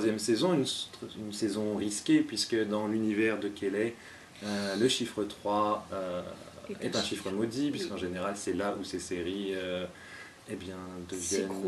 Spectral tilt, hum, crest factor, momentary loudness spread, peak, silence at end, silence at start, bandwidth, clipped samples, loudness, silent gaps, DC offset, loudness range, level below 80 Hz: -4 dB/octave; none; 18 dB; 14 LU; -14 dBFS; 0 s; 0 s; 13 kHz; under 0.1%; -32 LUFS; none; under 0.1%; 5 LU; -66 dBFS